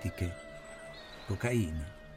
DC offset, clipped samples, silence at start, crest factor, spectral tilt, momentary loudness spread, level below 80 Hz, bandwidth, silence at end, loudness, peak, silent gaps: under 0.1%; under 0.1%; 0 s; 20 dB; -6 dB/octave; 15 LU; -50 dBFS; 16 kHz; 0 s; -37 LUFS; -18 dBFS; none